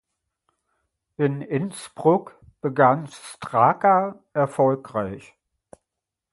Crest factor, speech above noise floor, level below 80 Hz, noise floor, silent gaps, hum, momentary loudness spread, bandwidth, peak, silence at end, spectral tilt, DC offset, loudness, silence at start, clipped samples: 22 dB; 63 dB; -62 dBFS; -85 dBFS; none; none; 13 LU; 11.5 kHz; -2 dBFS; 1.15 s; -7 dB/octave; under 0.1%; -22 LUFS; 1.2 s; under 0.1%